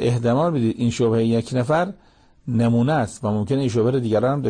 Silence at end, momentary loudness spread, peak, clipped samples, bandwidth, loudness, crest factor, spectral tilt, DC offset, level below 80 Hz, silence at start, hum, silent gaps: 0 s; 5 LU; -10 dBFS; under 0.1%; 9.8 kHz; -21 LUFS; 10 dB; -7.5 dB/octave; under 0.1%; -52 dBFS; 0 s; none; none